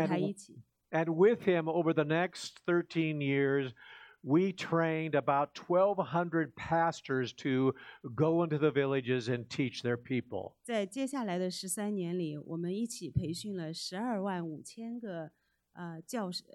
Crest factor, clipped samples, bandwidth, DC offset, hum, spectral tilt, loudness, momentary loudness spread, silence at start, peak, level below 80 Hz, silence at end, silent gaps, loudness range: 18 dB; under 0.1%; 14 kHz; under 0.1%; none; -6 dB/octave; -33 LUFS; 13 LU; 0 s; -14 dBFS; -66 dBFS; 0.15 s; none; 6 LU